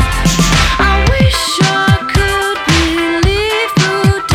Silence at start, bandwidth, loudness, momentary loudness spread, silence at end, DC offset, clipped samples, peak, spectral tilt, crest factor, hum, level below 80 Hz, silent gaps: 0 s; 17.5 kHz; -11 LUFS; 3 LU; 0 s; under 0.1%; under 0.1%; 0 dBFS; -4.5 dB/octave; 12 dB; none; -20 dBFS; none